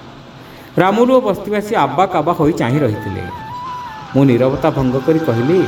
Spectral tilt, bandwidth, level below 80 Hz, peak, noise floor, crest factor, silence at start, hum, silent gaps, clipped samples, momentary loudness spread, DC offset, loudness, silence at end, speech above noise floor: -7.5 dB/octave; 18 kHz; -44 dBFS; 0 dBFS; -36 dBFS; 14 dB; 0 s; none; none; under 0.1%; 14 LU; under 0.1%; -15 LUFS; 0 s; 22 dB